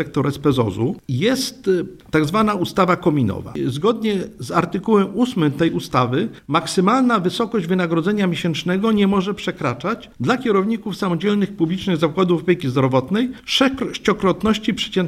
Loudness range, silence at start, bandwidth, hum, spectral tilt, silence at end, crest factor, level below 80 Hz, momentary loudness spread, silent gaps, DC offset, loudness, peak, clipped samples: 1 LU; 0 s; 14.5 kHz; none; -6 dB/octave; 0 s; 18 dB; -50 dBFS; 6 LU; none; under 0.1%; -19 LUFS; -2 dBFS; under 0.1%